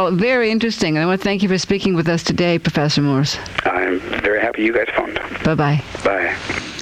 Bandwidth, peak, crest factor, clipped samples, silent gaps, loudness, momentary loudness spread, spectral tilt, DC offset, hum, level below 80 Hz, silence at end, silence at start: 13.5 kHz; -4 dBFS; 14 dB; under 0.1%; none; -18 LUFS; 4 LU; -5.5 dB/octave; under 0.1%; none; -44 dBFS; 0 s; 0 s